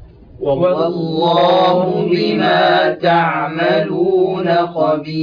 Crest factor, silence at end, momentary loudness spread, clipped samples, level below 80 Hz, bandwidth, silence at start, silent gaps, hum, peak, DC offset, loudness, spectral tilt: 12 dB; 0 s; 5 LU; under 0.1%; -50 dBFS; 5.2 kHz; 0 s; none; none; -2 dBFS; under 0.1%; -14 LUFS; -8 dB/octave